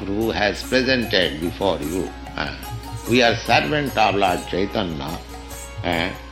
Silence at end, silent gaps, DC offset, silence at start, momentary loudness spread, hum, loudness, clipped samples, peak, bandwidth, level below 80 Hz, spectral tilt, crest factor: 0 s; none; under 0.1%; 0 s; 14 LU; none; -21 LUFS; under 0.1%; -2 dBFS; 16.5 kHz; -38 dBFS; -4.5 dB/octave; 20 dB